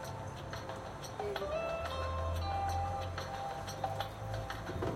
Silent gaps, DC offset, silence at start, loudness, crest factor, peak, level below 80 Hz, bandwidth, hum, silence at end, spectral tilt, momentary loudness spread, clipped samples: none; under 0.1%; 0 s; -39 LUFS; 18 dB; -22 dBFS; -50 dBFS; 16 kHz; none; 0 s; -5.5 dB/octave; 7 LU; under 0.1%